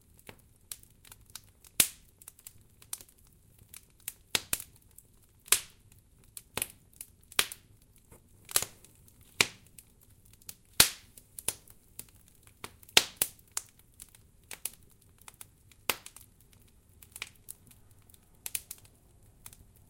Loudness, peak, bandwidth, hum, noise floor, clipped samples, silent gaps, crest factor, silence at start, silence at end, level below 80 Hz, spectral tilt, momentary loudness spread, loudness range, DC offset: -31 LUFS; -2 dBFS; 17 kHz; none; -61 dBFS; under 0.1%; none; 36 dB; 0.7 s; 1.15 s; -62 dBFS; 0.5 dB/octave; 26 LU; 12 LU; under 0.1%